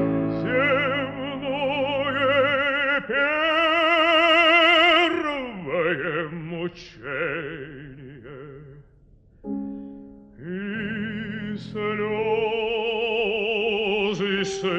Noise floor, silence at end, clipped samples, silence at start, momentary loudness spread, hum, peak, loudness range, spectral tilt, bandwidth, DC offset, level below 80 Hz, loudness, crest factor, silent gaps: -54 dBFS; 0 s; under 0.1%; 0 s; 21 LU; none; -6 dBFS; 16 LU; -5 dB/octave; 9 kHz; under 0.1%; -54 dBFS; -22 LUFS; 18 dB; none